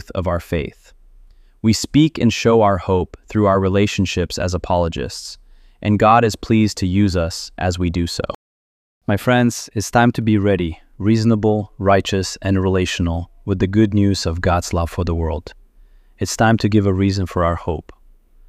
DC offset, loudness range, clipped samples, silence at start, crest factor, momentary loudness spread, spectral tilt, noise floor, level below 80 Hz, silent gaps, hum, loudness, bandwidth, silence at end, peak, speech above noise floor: under 0.1%; 3 LU; under 0.1%; 0.1 s; 16 dB; 10 LU; -6 dB/octave; -48 dBFS; -36 dBFS; 8.35-9.01 s; none; -18 LUFS; 15 kHz; 0.65 s; -2 dBFS; 31 dB